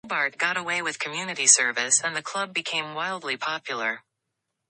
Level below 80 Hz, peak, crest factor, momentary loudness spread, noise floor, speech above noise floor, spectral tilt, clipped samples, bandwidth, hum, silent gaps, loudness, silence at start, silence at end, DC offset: -78 dBFS; -2 dBFS; 26 dB; 12 LU; -81 dBFS; 55 dB; 0 dB/octave; under 0.1%; 11 kHz; none; none; -24 LUFS; 0.05 s; 0.7 s; under 0.1%